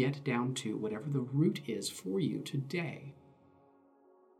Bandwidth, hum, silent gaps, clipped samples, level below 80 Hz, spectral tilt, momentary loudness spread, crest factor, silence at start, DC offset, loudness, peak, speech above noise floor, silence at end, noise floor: 15 kHz; none; none; under 0.1%; -80 dBFS; -6 dB/octave; 6 LU; 18 dB; 0 s; under 0.1%; -35 LUFS; -18 dBFS; 30 dB; 1.2 s; -65 dBFS